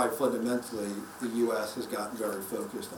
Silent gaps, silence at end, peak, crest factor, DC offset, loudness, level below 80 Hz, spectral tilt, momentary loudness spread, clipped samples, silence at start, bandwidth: none; 0 s; -14 dBFS; 18 dB; under 0.1%; -33 LUFS; -70 dBFS; -4 dB/octave; 7 LU; under 0.1%; 0 s; over 20 kHz